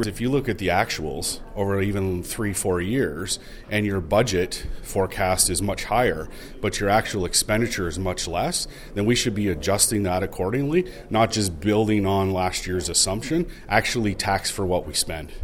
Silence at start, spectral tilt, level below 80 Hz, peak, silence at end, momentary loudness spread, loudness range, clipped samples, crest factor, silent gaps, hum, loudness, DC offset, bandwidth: 0 s; -4 dB/octave; -38 dBFS; -4 dBFS; 0 s; 8 LU; 2 LU; under 0.1%; 20 dB; none; none; -23 LUFS; under 0.1%; 17 kHz